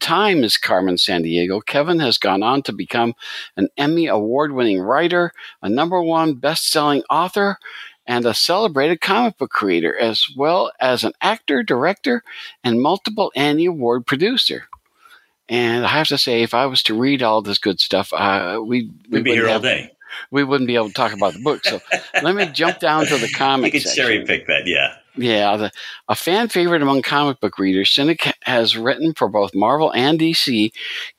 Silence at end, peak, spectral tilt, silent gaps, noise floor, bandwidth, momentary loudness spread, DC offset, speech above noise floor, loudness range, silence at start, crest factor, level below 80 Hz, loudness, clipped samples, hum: 0.1 s; -2 dBFS; -4 dB/octave; none; -51 dBFS; 16 kHz; 7 LU; under 0.1%; 33 dB; 2 LU; 0 s; 16 dB; -66 dBFS; -17 LUFS; under 0.1%; none